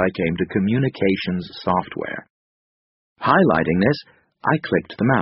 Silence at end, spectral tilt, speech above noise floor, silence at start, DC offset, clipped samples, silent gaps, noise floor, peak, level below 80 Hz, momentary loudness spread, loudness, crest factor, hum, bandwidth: 0 s; -5.5 dB/octave; over 70 dB; 0 s; under 0.1%; under 0.1%; 2.30-3.16 s; under -90 dBFS; -2 dBFS; -50 dBFS; 11 LU; -21 LUFS; 20 dB; none; 5.8 kHz